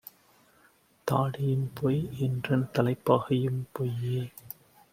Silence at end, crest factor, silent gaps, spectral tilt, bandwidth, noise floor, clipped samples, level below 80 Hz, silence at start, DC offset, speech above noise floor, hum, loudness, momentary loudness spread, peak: 0.45 s; 22 dB; none; -8 dB/octave; 16 kHz; -63 dBFS; under 0.1%; -62 dBFS; 1.05 s; under 0.1%; 35 dB; none; -29 LUFS; 15 LU; -8 dBFS